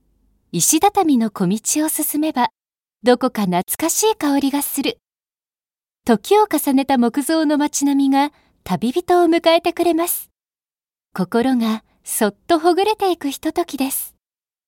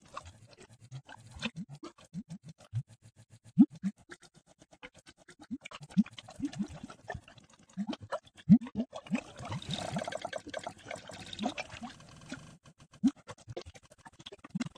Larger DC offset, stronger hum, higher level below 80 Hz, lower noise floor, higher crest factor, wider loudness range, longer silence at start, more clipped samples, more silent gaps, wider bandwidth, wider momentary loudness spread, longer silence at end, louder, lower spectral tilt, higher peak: neither; neither; first, -58 dBFS vs -64 dBFS; first, under -90 dBFS vs -62 dBFS; second, 18 dB vs 26 dB; second, 3 LU vs 7 LU; first, 0.55 s vs 0.15 s; neither; neither; first, 17 kHz vs 10.5 kHz; second, 8 LU vs 26 LU; first, 0.6 s vs 0.1 s; first, -18 LUFS vs -35 LUFS; second, -4 dB/octave vs -6.5 dB/octave; first, 0 dBFS vs -10 dBFS